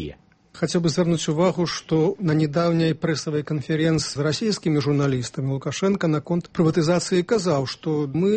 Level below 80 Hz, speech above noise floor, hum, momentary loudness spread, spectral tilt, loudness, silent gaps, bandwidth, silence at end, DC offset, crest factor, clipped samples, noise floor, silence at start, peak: -54 dBFS; 21 dB; none; 5 LU; -6 dB/octave; -22 LUFS; none; 8.8 kHz; 0 s; under 0.1%; 14 dB; under 0.1%; -43 dBFS; 0 s; -8 dBFS